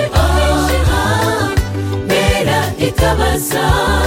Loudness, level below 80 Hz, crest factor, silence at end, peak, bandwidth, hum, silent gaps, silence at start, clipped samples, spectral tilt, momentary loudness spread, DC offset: -14 LUFS; -20 dBFS; 12 dB; 0 s; 0 dBFS; 17 kHz; none; none; 0 s; under 0.1%; -5 dB/octave; 4 LU; under 0.1%